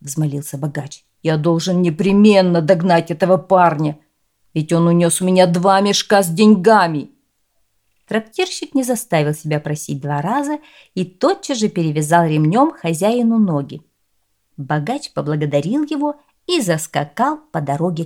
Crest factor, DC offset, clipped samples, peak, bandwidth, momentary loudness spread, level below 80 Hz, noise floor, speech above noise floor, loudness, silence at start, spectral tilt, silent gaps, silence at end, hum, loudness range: 16 dB; under 0.1%; under 0.1%; 0 dBFS; 16.5 kHz; 12 LU; -60 dBFS; -68 dBFS; 52 dB; -16 LUFS; 0.05 s; -5.5 dB/octave; none; 0 s; none; 7 LU